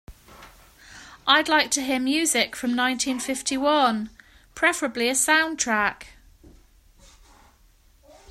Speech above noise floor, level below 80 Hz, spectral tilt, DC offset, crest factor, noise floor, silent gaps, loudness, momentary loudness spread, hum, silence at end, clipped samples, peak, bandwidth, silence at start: 34 dB; -56 dBFS; -1 dB/octave; under 0.1%; 22 dB; -57 dBFS; none; -22 LUFS; 8 LU; none; 2.25 s; under 0.1%; -4 dBFS; 16 kHz; 0.1 s